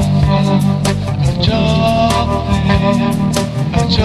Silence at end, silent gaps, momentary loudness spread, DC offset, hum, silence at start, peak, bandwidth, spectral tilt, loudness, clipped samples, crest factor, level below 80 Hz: 0 s; none; 4 LU; under 0.1%; none; 0 s; 0 dBFS; 14 kHz; -6.5 dB/octave; -14 LUFS; under 0.1%; 12 dB; -26 dBFS